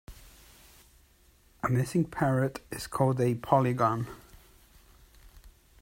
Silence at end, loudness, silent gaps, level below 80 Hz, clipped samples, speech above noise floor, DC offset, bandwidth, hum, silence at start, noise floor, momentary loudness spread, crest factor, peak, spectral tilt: 0.3 s; -29 LUFS; none; -56 dBFS; under 0.1%; 34 dB; under 0.1%; 16 kHz; none; 0.1 s; -62 dBFS; 12 LU; 24 dB; -8 dBFS; -7 dB/octave